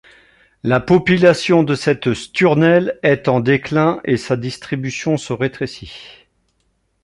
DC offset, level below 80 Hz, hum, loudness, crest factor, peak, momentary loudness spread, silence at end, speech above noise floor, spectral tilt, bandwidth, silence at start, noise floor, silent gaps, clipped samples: under 0.1%; -48 dBFS; none; -16 LUFS; 16 dB; -2 dBFS; 12 LU; 0.9 s; 49 dB; -6.5 dB/octave; 11.5 kHz; 0.65 s; -65 dBFS; none; under 0.1%